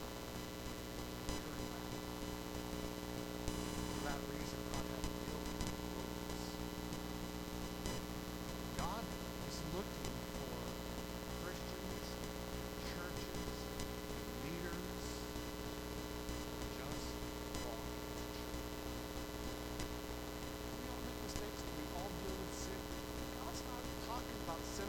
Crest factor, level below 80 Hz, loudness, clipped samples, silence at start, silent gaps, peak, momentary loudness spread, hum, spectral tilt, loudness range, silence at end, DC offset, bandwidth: 24 dB; -52 dBFS; -45 LUFS; under 0.1%; 0 s; none; -20 dBFS; 3 LU; 60 Hz at -50 dBFS; -4.5 dB/octave; 2 LU; 0 s; under 0.1%; 20 kHz